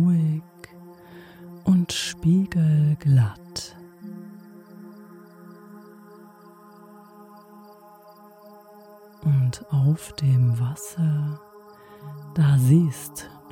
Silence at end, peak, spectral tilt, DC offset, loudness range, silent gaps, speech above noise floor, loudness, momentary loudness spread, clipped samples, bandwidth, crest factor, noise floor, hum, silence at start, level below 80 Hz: 0.25 s; -6 dBFS; -6.5 dB/octave; under 0.1%; 18 LU; none; 28 dB; -22 LUFS; 25 LU; under 0.1%; 16.5 kHz; 18 dB; -49 dBFS; none; 0 s; -56 dBFS